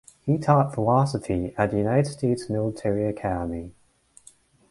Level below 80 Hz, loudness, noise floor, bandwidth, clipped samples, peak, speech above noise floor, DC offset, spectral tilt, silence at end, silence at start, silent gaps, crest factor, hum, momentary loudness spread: -48 dBFS; -24 LUFS; -55 dBFS; 11.5 kHz; under 0.1%; -6 dBFS; 32 dB; under 0.1%; -7.5 dB/octave; 1 s; 0.25 s; none; 18 dB; none; 8 LU